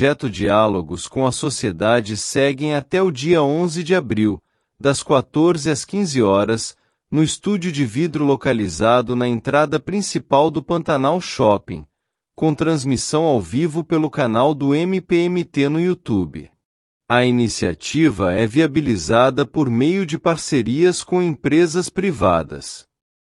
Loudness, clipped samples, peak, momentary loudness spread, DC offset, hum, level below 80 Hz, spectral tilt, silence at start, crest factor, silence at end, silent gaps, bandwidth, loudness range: -18 LUFS; under 0.1%; -2 dBFS; 6 LU; under 0.1%; none; -50 dBFS; -5.5 dB/octave; 0 s; 16 dB; 0.45 s; 16.65-17.00 s; 12 kHz; 2 LU